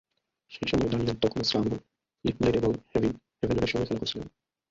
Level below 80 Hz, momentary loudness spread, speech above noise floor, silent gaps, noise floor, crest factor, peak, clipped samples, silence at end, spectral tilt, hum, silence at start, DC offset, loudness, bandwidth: -48 dBFS; 9 LU; 32 dB; none; -59 dBFS; 18 dB; -10 dBFS; under 0.1%; 0.4 s; -6 dB/octave; none; 0.5 s; under 0.1%; -29 LUFS; 7.8 kHz